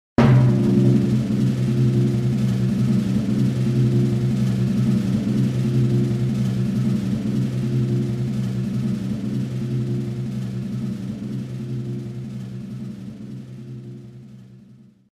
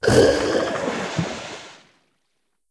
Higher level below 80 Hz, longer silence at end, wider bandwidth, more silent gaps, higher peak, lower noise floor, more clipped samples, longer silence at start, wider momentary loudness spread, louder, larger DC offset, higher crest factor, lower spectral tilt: about the same, -44 dBFS vs -44 dBFS; second, 0.5 s vs 0.95 s; about the same, 10 kHz vs 11 kHz; neither; about the same, -2 dBFS vs -2 dBFS; second, -48 dBFS vs -75 dBFS; neither; first, 0.2 s vs 0 s; about the same, 16 LU vs 18 LU; about the same, -21 LUFS vs -21 LUFS; neither; about the same, 18 dB vs 20 dB; first, -8.5 dB/octave vs -5 dB/octave